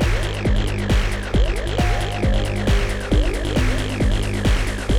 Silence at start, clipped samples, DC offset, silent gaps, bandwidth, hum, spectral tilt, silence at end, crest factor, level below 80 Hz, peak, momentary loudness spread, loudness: 0 s; under 0.1%; 0.8%; none; 14 kHz; none; -5.5 dB/octave; 0 s; 12 dB; -22 dBFS; -6 dBFS; 1 LU; -21 LUFS